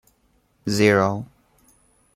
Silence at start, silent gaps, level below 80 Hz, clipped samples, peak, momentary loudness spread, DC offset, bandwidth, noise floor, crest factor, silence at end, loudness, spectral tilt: 0.65 s; none; -60 dBFS; under 0.1%; -4 dBFS; 17 LU; under 0.1%; 15.5 kHz; -64 dBFS; 20 dB; 0.9 s; -20 LUFS; -5.5 dB/octave